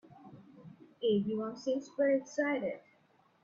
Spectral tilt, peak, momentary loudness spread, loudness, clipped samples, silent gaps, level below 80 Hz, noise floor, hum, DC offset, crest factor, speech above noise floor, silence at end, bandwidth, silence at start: -6 dB/octave; -20 dBFS; 24 LU; -34 LUFS; under 0.1%; none; -78 dBFS; -68 dBFS; none; under 0.1%; 16 dB; 36 dB; 0.65 s; 7.6 kHz; 0.2 s